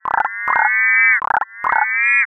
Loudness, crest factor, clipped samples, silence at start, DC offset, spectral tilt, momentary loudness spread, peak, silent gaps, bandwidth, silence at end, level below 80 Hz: -14 LUFS; 14 dB; under 0.1%; 0.05 s; under 0.1%; -4 dB/octave; 8 LU; -2 dBFS; none; 6.4 kHz; 0.1 s; -60 dBFS